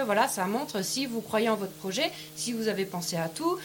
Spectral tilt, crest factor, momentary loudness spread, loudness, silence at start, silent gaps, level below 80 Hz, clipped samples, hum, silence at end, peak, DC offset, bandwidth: -3.5 dB/octave; 18 dB; 5 LU; -30 LUFS; 0 s; none; -70 dBFS; under 0.1%; none; 0 s; -12 dBFS; under 0.1%; 17 kHz